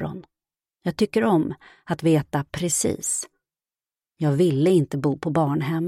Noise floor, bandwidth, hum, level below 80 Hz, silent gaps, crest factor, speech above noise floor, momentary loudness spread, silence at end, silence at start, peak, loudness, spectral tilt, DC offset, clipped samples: under -90 dBFS; 15.5 kHz; none; -56 dBFS; none; 18 dB; over 68 dB; 12 LU; 0 s; 0 s; -6 dBFS; -23 LUFS; -5.5 dB/octave; under 0.1%; under 0.1%